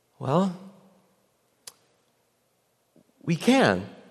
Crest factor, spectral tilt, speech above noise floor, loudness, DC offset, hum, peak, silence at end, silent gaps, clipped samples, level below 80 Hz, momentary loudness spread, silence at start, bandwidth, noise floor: 22 dB; -5.5 dB/octave; 47 dB; -24 LUFS; under 0.1%; 60 Hz at -65 dBFS; -6 dBFS; 0.15 s; none; under 0.1%; -70 dBFS; 27 LU; 0.2 s; 13 kHz; -70 dBFS